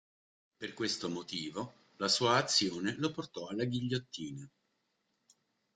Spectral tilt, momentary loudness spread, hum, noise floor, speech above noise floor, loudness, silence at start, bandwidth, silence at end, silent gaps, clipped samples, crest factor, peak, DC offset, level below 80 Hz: -3.5 dB/octave; 17 LU; none; -81 dBFS; 46 dB; -34 LUFS; 0.6 s; 11 kHz; 1.25 s; none; under 0.1%; 22 dB; -14 dBFS; under 0.1%; -72 dBFS